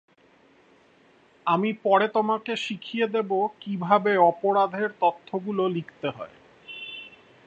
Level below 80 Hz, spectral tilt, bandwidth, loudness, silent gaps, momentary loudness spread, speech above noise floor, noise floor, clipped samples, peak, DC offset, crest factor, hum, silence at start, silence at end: -76 dBFS; -6.5 dB/octave; 8.2 kHz; -25 LUFS; none; 17 LU; 35 dB; -59 dBFS; under 0.1%; -4 dBFS; under 0.1%; 22 dB; none; 1.45 s; 0.4 s